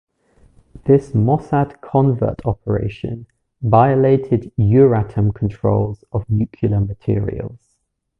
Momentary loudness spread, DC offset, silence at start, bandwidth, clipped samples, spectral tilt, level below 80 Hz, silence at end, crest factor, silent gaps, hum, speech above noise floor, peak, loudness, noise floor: 13 LU; under 0.1%; 0.85 s; 4.1 kHz; under 0.1%; -11 dB/octave; -38 dBFS; 0.65 s; 16 dB; none; none; 52 dB; 0 dBFS; -17 LUFS; -69 dBFS